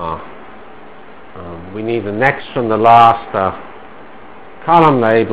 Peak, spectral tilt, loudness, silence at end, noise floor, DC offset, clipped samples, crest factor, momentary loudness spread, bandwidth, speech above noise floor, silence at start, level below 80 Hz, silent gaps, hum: 0 dBFS; -10 dB/octave; -12 LUFS; 0 s; -38 dBFS; 2%; 0.5%; 14 dB; 23 LU; 4 kHz; 26 dB; 0 s; -44 dBFS; none; none